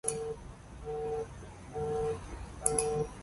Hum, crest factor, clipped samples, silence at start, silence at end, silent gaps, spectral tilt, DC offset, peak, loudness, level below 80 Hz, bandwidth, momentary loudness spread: none; 26 dB; under 0.1%; 0.05 s; 0 s; none; -4 dB/octave; under 0.1%; -10 dBFS; -35 LUFS; -50 dBFS; 12 kHz; 15 LU